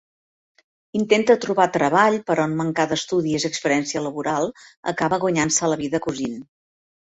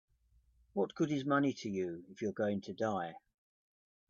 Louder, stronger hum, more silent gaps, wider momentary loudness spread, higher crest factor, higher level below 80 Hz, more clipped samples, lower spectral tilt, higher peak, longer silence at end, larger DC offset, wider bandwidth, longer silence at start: first, -21 LUFS vs -37 LUFS; neither; first, 4.77-4.83 s vs none; about the same, 11 LU vs 9 LU; about the same, 20 dB vs 18 dB; first, -60 dBFS vs -76 dBFS; neither; second, -4 dB/octave vs -6.5 dB/octave; first, -2 dBFS vs -20 dBFS; second, 0.6 s vs 0.9 s; neither; first, 8.4 kHz vs 7.4 kHz; first, 0.95 s vs 0.75 s